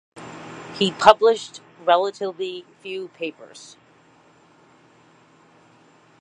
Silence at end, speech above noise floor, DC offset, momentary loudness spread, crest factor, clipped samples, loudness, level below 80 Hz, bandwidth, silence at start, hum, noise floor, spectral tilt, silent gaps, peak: 2.6 s; 34 dB; under 0.1%; 25 LU; 24 dB; under 0.1%; -21 LUFS; -66 dBFS; 11 kHz; 0.15 s; none; -55 dBFS; -4 dB/octave; none; 0 dBFS